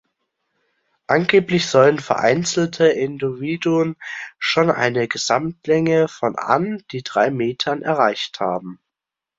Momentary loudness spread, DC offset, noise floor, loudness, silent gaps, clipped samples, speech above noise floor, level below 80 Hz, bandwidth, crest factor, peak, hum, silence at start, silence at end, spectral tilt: 9 LU; under 0.1%; -85 dBFS; -19 LUFS; none; under 0.1%; 67 dB; -60 dBFS; 7.8 kHz; 18 dB; -2 dBFS; none; 1.1 s; 0.65 s; -5 dB/octave